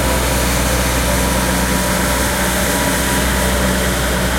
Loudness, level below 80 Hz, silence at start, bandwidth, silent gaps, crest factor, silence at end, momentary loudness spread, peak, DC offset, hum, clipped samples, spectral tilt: -15 LUFS; -22 dBFS; 0 s; 16.5 kHz; none; 14 dB; 0 s; 1 LU; -2 dBFS; under 0.1%; none; under 0.1%; -3.5 dB/octave